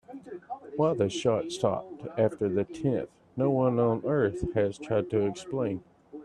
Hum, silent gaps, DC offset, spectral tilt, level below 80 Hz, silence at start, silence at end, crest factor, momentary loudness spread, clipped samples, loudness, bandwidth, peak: none; none; under 0.1%; -7 dB/octave; -56 dBFS; 0.1 s; 0 s; 18 dB; 14 LU; under 0.1%; -29 LUFS; 10.5 kHz; -12 dBFS